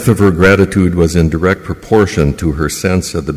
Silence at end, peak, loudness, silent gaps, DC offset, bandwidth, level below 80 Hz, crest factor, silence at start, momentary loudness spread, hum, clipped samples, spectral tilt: 0 s; 0 dBFS; -12 LUFS; none; under 0.1%; 16 kHz; -24 dBFS; 12 dB; 0 s; 7 LU; none; under 0.1%; -6 dB/octave